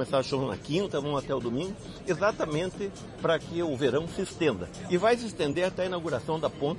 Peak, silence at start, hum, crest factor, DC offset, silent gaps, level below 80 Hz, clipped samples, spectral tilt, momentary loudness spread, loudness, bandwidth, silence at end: -12 dBFS; 0 s; none; 18 dB; under 0.1%; none; -54 dBFS; under 0.1%; -5.5 dB/octave; 7 LU; -30 LUFS; 11.5 kHz; 0 s